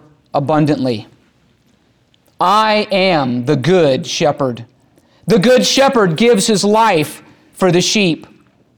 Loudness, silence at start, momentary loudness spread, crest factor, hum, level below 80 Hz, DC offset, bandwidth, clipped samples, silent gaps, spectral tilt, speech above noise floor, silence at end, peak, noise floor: -13 LUFS; 0.35 s; 10 LU; 12 dB; none; -54 dBFS; under 0.1%; over 20 kHz; under 0.1%; none; -4.5 dB/octave; 43 dB; 0.55 s; -2 dBFS; -55 dBFS